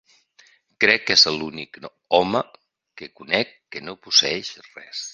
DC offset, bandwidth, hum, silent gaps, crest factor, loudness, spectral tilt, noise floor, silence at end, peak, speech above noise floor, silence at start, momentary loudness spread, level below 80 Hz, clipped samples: under 0.1%; 10 kHz; none; none; 22 dB; -19 LUFS; -1.5 dB/octave; -57 dBFS; 0 s; 0 dBFS; 34 dB; 0.8 s; 24 LU; -62 dBFS; under 0.1%